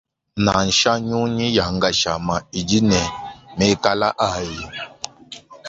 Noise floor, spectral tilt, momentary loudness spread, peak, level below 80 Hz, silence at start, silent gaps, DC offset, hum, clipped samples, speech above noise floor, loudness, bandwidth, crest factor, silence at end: -41 dBFS; -4 dB/octave; 17 LU; 0 dBFS; -42 dBFS; 0.35 s; none; under 0.1%; none; under 0.1%; 22 dB; -19 LUFS; 8 kHz; 20 dB; 0 s